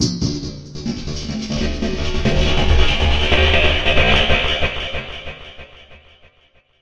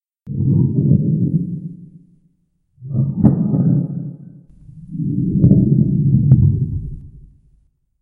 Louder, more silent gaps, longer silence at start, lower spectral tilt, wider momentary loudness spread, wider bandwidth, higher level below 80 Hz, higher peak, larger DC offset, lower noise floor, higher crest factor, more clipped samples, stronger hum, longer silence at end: about the same, -18 LUFS vs -16 LUFS; neither; second, 0 s vs 0.25 s; second, -4.5 dB/octave vs -15 dB/octave; about the same, 16 LU vs 16 LU; first, 8.2 kHz vs 1.5 kHz; first, -22 dBFS vs -36 dBFS; about the same, 0 dBFS vs 0 dBFS; neither; second, -55 dBFS vs -63 dBFS; about the same, 16 dB vs 16 dB; neither; neither; second, 0 s vs 0.8 s